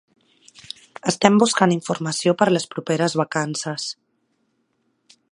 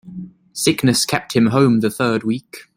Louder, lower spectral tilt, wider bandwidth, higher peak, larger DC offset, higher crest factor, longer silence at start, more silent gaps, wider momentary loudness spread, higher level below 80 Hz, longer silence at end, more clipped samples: second, -20 LUFS vs -17 LUFS; about the same, -4.5 dB/octave vs -4.5 dB/octave; second, 11.5 kHz vs 16.5 kHz; about the same, 0 dBFS vs -2 dBFS; neither; first, 22 dB vs 16 dB; first, 1.05 s vs 0.05 s; neither; about the same, 18 LU vs 16 LU; second, -64 dBFS vs -54 dBFS; first, 1.4 s vs 0.15 s; neither